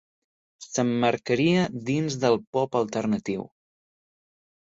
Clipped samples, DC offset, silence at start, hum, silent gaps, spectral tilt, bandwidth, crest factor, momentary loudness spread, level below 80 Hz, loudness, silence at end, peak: under 0.1%; under 0.1%; 0.6 s; none; 2.47-2.53 s; -5.5 dB/octave; 8 kHz; 18 dB; 9 LU; -64 dBFS; -25 LUFS; 1.25 s; -8 dBFS